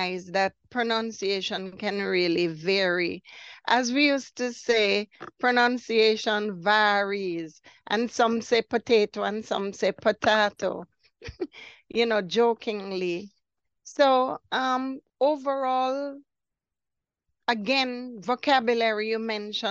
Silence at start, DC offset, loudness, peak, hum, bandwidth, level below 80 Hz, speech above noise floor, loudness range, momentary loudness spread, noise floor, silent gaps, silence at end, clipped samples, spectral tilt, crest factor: 0 s; under 0.1%; -25 LUFS; -6 dBFS; none; 8 kHz; -66 dBFS; 62 dB; 4 LU; 13 LU; -88 dBFS; none; 0 s; under 0.1%; -4 dB/octave; 20 dB